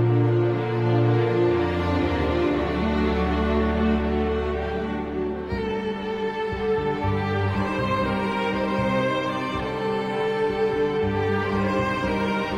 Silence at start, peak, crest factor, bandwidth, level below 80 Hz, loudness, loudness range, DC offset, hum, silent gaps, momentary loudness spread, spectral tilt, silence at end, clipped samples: 0 s; -10 dBFS; 14 dB; 9.2 kHz; -36 dBFS; -24 LUFS; 4 LU; under 0.1%; none; none; 6 LU; -8 dB/octave; 0 s; under 0.1%